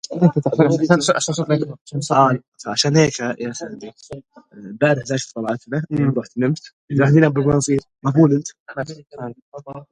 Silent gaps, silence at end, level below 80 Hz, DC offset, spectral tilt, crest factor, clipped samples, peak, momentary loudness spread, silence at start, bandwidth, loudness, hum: 1.81-1.85 s, 2.48-2.52 s, 6.73-6.88 s, 8.60-8.66 s, 9.42-9.52 s; 0.1 s; -52 dBFS; under 0.1%; -5.5 dB/octave; 18 dB; under 0.1%; 0 dBFS; 18 LU; 0.1 s; 10.5 kHz; -18 LUFS; none